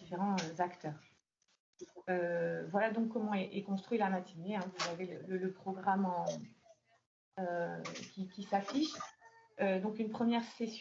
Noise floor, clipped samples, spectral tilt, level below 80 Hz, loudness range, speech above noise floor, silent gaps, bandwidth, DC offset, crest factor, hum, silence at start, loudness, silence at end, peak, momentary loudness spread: -68 dBFS; under 0.1%; -4.5 dB/octave; -82 dBFS; 3 LU; 30 dB; 1.60-1.73 s, 7.06-7.32 s; 7.6 kHz; under 0.1%; 18 dB; none; 0 s; -38 LUFS; 0 s; -20 dBFS; 13 LU